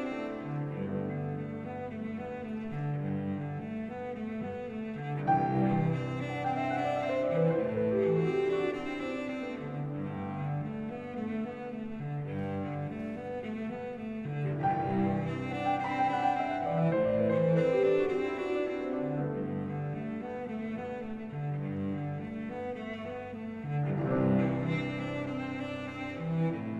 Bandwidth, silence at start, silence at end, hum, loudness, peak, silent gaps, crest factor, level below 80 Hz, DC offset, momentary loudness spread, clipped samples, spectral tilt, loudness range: 8.4 kHz; 0 s; 0 s; none; -33 LUFS; -16 dBFS; none; 16 dB; -62 dBFS; under 0.1%; 10 LU; under 0.1%; -8.5 dB/octave; 8 LU